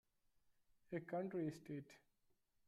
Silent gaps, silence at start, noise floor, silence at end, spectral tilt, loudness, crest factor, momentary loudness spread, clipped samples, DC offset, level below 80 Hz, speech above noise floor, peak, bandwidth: none; 0.9 s; -82 dBFS; 0.7 s; -8 dB/octave; -48 LUFS; 18 dB; 9 LU; under 0.1%; under 0.1%; -84 dBFS; 34 dB; -34 dBFS; 13.5 kHz